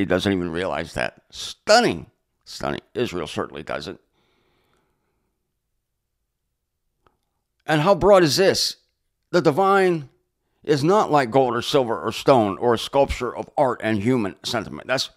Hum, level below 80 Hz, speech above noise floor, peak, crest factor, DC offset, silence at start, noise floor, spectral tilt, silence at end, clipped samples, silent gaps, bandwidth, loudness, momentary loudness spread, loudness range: none; -48 dBFS; 57 dB; -2 dBFS; 20 dB; under 0.1%; 0 s; -77 dBFS; -5 dB/octave; 0.1 s; under 0.1%; none; 16 kHz; -21 LUFS; 14 LU; 13 LU